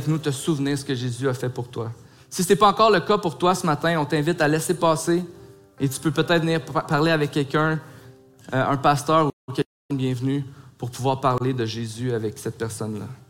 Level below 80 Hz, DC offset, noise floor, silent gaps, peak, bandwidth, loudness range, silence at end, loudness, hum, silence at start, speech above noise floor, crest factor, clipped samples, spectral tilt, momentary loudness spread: -58 dBFS; under 0.1%; -48 dBFS; 9.33-9.48 s, 9.66-9.89 s; -4 dBFS; 16.5 kHz; 5 LU; 0.15 s; -23 LUFS; none; 0 s; 26 dB; 18 dB; under 0.1%; -5.5 dB/octave; 11 LU